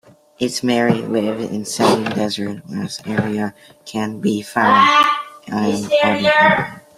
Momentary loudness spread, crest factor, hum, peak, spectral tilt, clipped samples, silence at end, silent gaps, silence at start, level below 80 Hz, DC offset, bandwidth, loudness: 13 LU; 16 dB; none; -2 dBFS; -4.5 dB/octave; under 0.1%; 0.2 s; none; 0.4 s; -58 dBFS; under 0.1%; 15.5 kHz; -17 LUFS